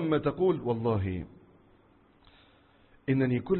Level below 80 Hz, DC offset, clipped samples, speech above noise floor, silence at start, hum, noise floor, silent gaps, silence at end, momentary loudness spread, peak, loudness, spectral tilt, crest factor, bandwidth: -52 dBFS; under 0.1%; under 0.1%; 34 dB; 0 s; none; -62 dBFS; none; 0 s; 12 LU; -14 dBFS; -30 LUFS; -11.5 dB/octave; 18 dB; 4.3 kHz